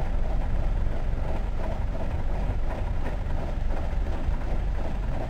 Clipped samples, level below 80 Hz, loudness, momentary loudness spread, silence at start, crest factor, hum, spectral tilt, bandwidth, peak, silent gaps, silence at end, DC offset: under 0.1%; -26 dBFS; -32 LUFS; 2 LU; 0 s; 12 dB; none; -8 dB/octave; 5.4 kHz; -12 dBFS; none; 0 s; under 0.1%